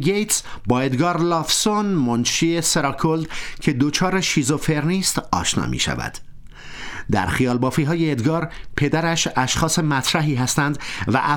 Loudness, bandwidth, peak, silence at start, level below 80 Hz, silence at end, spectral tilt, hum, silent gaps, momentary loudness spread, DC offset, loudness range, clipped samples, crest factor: -20 LUFS; 17.5 kHz; -4 dBFS; 0 s; -40 dBFS; 0 s; -4 dB/octave; none; none; 6 LU; under 0.1%; 3 LU; under 0.1%; 16 dB